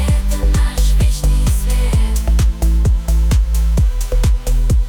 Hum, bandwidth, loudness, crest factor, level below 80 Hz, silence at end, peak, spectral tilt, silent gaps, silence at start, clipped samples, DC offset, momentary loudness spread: none; 18 kHz; -16 LUFS; 8 dB; -14 dBFS; 0 s; -4 dBFS; -5.5 dB/octave; none; 0 s; under 0.1%; under 0.1%; 2 LU